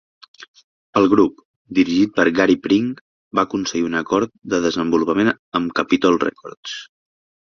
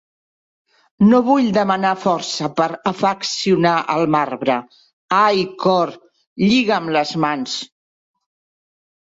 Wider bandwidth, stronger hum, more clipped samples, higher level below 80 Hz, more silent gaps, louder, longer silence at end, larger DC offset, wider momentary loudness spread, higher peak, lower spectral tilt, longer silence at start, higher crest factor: second, 7.2 kHz vs 8 kHz; neither; neither; about the same, -54 dBFS vs -58 dBFS; first, 0.48-0.54 s, 0.64-0.93 s, 1.45-1.65 s, 3.01-3.31 s, 5.39-5.52 s, 6.57-6.63 s vs 4.93-5.08 s, 6.27-6.36 s; about the same, -18 LUFS vs -17 LUFS; second, 0.6 s vs 1.35 s; neither; first, 11 LU vs 7 LU; about the same, -2 dBFS vs -2 dBFS; about the same, -5 dB/octave vs -5 dB/octave; second, 0.4 s vs 1 s; about the same, 18 dB vs 16 dB